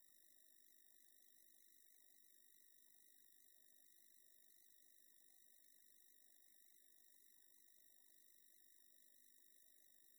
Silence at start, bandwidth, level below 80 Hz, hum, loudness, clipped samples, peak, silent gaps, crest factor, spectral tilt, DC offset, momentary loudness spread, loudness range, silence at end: 0 s; over 20 kHz; under -90 dBFS; none; -68 LUFS; under 0.1%; -52 dBFS; none; 20 dB; 2 dB/octave; under 0.1%; 0 LU; 0 LU; 0 s